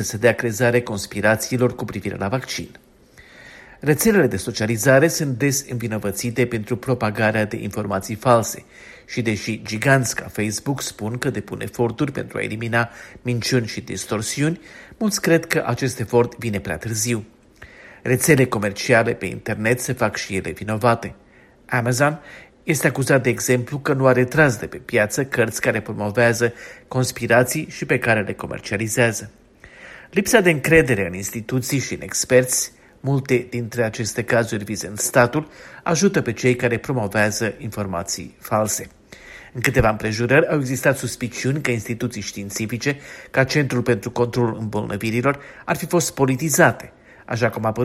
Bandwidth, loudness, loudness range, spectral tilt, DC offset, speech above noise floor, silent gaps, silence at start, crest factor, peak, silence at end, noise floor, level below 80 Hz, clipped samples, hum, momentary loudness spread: 16 kHz; -20 LUFS; 4 LU; -5 dB/octave; under 0.1%; 28 dB; none; 0 s; 20 dB; 0 dBFS; 0 s; -48 dBFS; -48 dBFS; under 0.1%; none; 11 LU